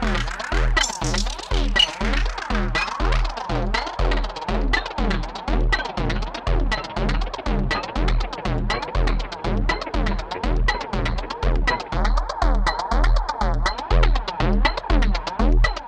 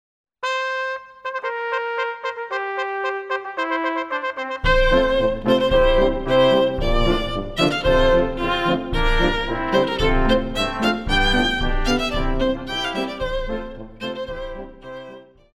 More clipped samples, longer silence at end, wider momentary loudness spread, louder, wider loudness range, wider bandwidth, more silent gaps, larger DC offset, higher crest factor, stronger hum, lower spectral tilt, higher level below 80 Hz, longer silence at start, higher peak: neither; second, 0 s vs 0.35 s; second, 5 LU vs 13 LU; about the same, -23 LUFS vs -21 LUFS; second, 3 LU vs 7 LU; second, 9.4 kHz vs 12.5 kHz; neither; neither; about the same, 18 dB vs 16 dB; neither; about the same, -4.5 dB/octave vs -5.5 dB/octave; first, -22 dBFS vs -28 dBFS; second, 0 s vs 0.4 s; about the same, -2 dBFS vs -4 dBFS